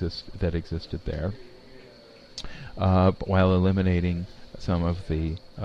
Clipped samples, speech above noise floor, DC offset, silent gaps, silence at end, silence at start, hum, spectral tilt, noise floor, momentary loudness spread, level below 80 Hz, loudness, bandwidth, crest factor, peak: under 0.1%; 25 dB; under 0.1%; none; 0 s; 0 s; none; -8 dB/octave; -50 dBFS; 18 LU; -40 dBFS; -26 LUFS; 7.6 kHz; 20 dB; -6 dBFS